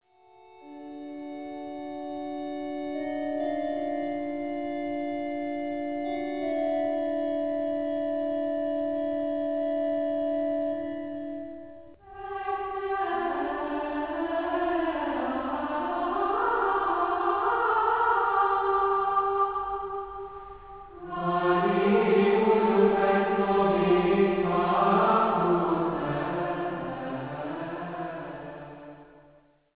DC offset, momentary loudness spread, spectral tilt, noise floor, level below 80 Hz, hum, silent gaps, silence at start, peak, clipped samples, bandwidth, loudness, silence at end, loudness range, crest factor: 0.1%; 16 LU; -5 dB/octave; -59 dBFS; -58 dBFS; none; none; 0.5 s; -10 dBFS; under 0.1%; 4 kHz; -27 LUFS; 0.55 s; 9 LU; 18 dB